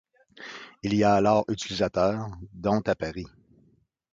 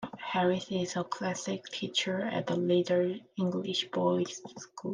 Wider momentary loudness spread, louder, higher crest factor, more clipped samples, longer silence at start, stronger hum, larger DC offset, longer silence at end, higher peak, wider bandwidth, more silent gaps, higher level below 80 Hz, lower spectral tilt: first, 20 LU vs 8 LU; first, -26 LUFS vs -31 LUFS; about the same, 18 dB vs 16 dB; neither; first, 0.4 s vs 0 s; neither; neither; first, 0.85 s vs 0 s; first, -8 dBFS vs -16 dBFS; second, 7.8 kHz vs 9.8 kHz; neither; first, -52 dBFS vs -76 dBFS; about the same, -6 dB/octave vs -5 dB/octave